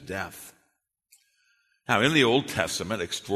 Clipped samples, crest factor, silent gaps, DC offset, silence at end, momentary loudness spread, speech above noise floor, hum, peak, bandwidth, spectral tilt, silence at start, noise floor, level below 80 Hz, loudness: under 0.1%; 22 dB; none; under 0.1%; 0 s; 19 LU; 49 dB; none; -6 dBFS; 13.5 kHz; -4 dB/octave; 0 s; -75 dBFS; -60 dBFS; -25 LUFS